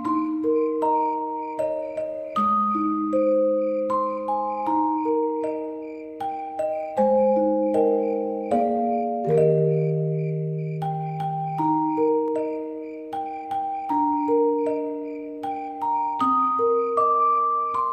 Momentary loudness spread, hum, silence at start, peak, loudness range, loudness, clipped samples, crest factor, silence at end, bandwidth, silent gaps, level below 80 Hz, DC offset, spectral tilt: 10 LU; none; 0 s; -10 dBFS; 4 LU; -24 LUFS; under 0.1%; 14 dB; 0 s; 8.8 kHz; none; -64 dBFS; under 0.1%; -9.5 dB/octave